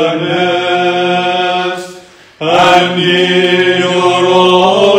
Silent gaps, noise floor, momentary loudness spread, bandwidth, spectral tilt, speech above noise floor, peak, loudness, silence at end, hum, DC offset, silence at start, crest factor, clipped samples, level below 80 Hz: none; -35 dBFS; 8 LU; 10.5 kHz; -4.5 dB/octave; 25 dB; 0 dBFS; -10 LUFS; 0 s; none; under 0.1%; 0 s; 10 dB; 0.7%; -52 dBFS